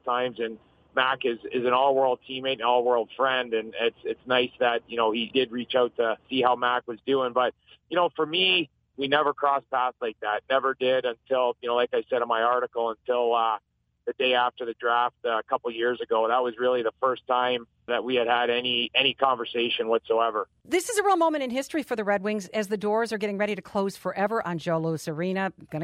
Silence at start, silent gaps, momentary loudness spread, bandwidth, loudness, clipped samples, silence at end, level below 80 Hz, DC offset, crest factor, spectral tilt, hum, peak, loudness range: 0.05 s; none; 7 LU; 15 kHz; -26 LUFS; under 0.1%; 0 s; -70 dBFS; under 0.1%; 20 dB; -4 dB/octave; none; -6 dBFS; 2 LU